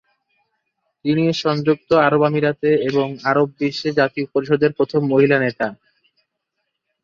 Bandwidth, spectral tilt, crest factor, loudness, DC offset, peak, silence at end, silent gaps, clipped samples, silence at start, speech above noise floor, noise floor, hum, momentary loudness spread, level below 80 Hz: 7.4 kHz; -7 dB/octave; 16 dB; -18 LUFS; under 0.1%; -2 dBFS; 1.3 s; none; under 0.1%; 1.05 s; 59 dB; -76 dBFS; none; 7 LU; -60 dBFS